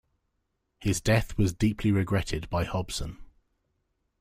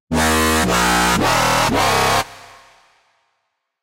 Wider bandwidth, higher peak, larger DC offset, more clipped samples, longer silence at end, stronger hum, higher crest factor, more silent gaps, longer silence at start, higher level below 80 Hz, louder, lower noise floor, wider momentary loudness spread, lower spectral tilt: about the same, 15.5 kHz vs 16 kHz; second, -12 dBFS vs -4 dBFS; neither; neither; second, 0.95 s vs 1.45 s; neither; about the same, 18 dB vs 14 dB; neither; first, 0.8 s vs 0.1 s; second, -42 dBFS vs -34 dBFS; second, -28 LUFS vs -15 LUFS; first, -78 dBFS vs -72 dBFS; first, 9 LU vs 3 LU; first, -5.5 dB/octave vs -3 dB/octave